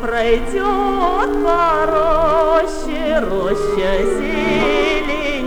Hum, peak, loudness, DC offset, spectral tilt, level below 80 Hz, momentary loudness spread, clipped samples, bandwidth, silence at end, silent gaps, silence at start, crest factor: none; -2 dBFS; -16 LUFS; under 0.1%; -5 dB/octave; -28 dBFS; 4 LU; under 0.1%; 19 kHz; 0 s; none; 0 s; 14 dB